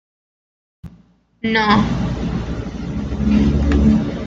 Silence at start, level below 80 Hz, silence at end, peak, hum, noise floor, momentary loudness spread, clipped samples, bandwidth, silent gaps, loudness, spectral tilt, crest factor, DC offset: 0.85 s; -26 dBFS; 0 s; -2 dBFS; none; -51 dBFS; 12 LU; under 0.1%; 7.4 kHz; none; -18 LUFS; -7 dB/octave; 16 dB; under 0.1%